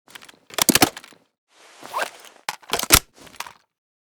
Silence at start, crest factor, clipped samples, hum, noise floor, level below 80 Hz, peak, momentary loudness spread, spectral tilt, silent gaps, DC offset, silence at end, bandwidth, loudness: 0.6 s; 24 dB; under 0.1%; none; -44 dBFS; -42 dBFS; 0 dBFS; 21 LU; -1.5 dB/octave; 1.38-1.47 s; under 0.1%; 0.7 s; over 20 kHz; -19 LUFS